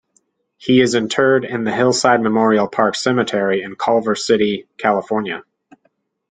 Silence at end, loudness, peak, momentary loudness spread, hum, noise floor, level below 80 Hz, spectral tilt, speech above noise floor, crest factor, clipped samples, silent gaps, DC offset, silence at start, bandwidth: 0.9 s; -16 LUFS; 0 dBFS; 7 LU; none; -64 dBFS; -58 dBFS; -4.5 dB/octave; 48 dB; 16 dB; under 0.1%; none; under 0.1%; 0.6 s; 9.6 kHz